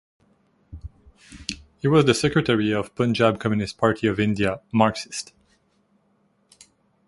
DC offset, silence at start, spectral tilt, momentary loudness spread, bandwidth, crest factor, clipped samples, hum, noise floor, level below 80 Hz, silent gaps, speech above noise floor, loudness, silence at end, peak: under 0.1%; 0.7 s; -5.5 dB/octave; 16 LU; 11.5 kHz; 22 dB; under 0.1%; none; -65 dBFS; -50 dBFS; none; 44 dB; -22 LUFS; 1.85 s; -2 dBFS